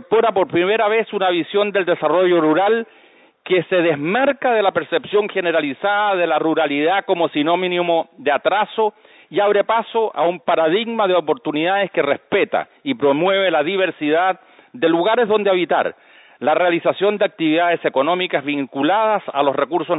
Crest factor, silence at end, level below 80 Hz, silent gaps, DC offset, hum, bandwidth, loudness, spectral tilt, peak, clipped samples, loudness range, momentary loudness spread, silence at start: 14 dB; 0 s; -70 dBFS; none; under 0.1%; none; 4 kHz; -18 LUFS; -10 dB/octave; -4 dBFS; under 0.1%; 1 LU; 5 LU; 0.1 s